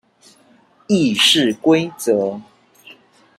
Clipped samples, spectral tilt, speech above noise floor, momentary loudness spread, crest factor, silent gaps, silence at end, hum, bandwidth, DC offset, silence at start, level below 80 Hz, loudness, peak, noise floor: under 0.1%; -3.5 dB/octave; 37 dB; 9 LU; 16 dB; none; 0.45 s; none; 15 kHz; under 0.1%; 0.9 s; -62 dBFS; -16 LUFS; -2 dBFS; -53 dBFS